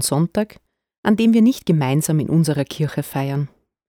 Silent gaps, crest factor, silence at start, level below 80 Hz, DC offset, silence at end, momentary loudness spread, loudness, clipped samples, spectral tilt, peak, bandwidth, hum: 0.98-1.03 s; 16 dB; 0 s; -56 dBFS; under 0.1%; 0.4 s; 10 LU; -19 LUFS; under 0.1%; -6 dB/octave; -2 dBFS; 18 kHz; none